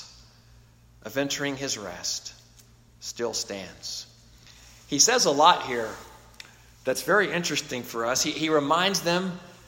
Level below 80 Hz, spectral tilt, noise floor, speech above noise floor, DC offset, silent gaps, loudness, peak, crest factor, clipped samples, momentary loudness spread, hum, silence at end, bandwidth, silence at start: -60 dBFS; -2 dB/octave; -55 dBFS; 29 dB; under 0.1%; none; -25 LUFS; -4 dBFS; 24 dB; under 0.1%; 18 LU; none; 0.1 s; 16.5 kHz; 0 s